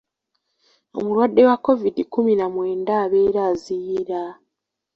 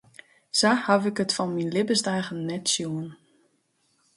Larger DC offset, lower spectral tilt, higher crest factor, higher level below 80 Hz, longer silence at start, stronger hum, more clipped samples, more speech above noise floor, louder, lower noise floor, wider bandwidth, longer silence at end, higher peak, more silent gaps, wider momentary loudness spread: neither; first, -7.5 dB/octave vs -3.5 dB/octave; about the same, 18 dB vs 22 dB; first, -60 dBFS vs -70 dBFS; first, 0.95 s vs 0.55 s; neither; neither; first, 61 dB vs 45 dB; first, -20 LUFS vs -25 LUFS; first, -80 dBFS vs -70 dBFS; second, 7.6 kHz vs 11.5 kHz; second, 0.6 s vs 1 s; first, -2 dBFS vs -6 dBFS; neither; first, 13 LU vs 10 LU